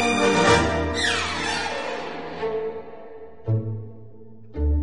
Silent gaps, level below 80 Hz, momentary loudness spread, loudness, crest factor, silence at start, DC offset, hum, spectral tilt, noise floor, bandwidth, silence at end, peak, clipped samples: none; -34 dBFS; 21 LU; -23 LUFS; 18 dB; 0 s; 0.8%; none; -4.5 dB/octave; -46 dBFS; 11.5 kHz; 0 s; -6 dBFS; under 0.1%